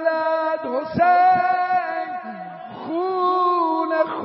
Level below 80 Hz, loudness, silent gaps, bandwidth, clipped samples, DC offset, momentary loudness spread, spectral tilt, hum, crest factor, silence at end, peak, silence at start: -66 dBFS; -20 LUFS; none; 5.8 kHz; under 0.1%; under 0.1%; 16 LU; -3.5 dB/octave; none; 14 dB; 0 s; -6 dBFS; 0 s